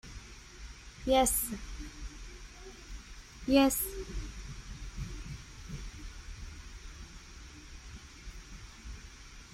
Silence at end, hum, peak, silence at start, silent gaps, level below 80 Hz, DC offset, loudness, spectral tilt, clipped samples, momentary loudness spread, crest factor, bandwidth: 0 s; none; -12 dBFS; 0.05 s; none; -46 dBFS; under 0.1%; -33 LUFS; -4 dB/octave; under 0.1%; 23 LU; 24 dB; 16 kHz